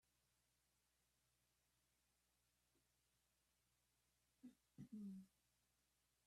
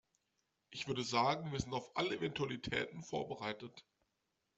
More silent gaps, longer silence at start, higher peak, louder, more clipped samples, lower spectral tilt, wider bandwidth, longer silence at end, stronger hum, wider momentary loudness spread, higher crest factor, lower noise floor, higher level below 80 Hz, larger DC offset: neither; first, 4.45 s vs 0.7 s; second, -48 dBFS vs -20 dBFS; second, -61 LUFS vs -39 LUFS; neither; first, -6.5 dB/octave vs -4.5 dB/octave; first, 13 kHz vs 8.2 kHz; first, 1 s vs 0.75 s; first, 60 Hz at -90 dBFS vs none; about the same, 12 LU vs 11 LU; about the same, 20 dB vs 22 dB; about the same, -87 dBFS vs -85 dBFS; second, under -90 dBFS vs -66 dBFS; neither